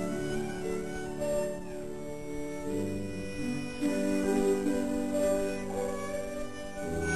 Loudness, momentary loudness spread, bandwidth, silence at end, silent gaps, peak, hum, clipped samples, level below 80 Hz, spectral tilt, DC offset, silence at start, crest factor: -33 LUFS; 11 LU; 13.5 kHz; 0 s; none; -16 dBFS; none; under 0.1%; -50 dBFS; -5.5 dB/octave; 0.7%; 0 s; 16 dB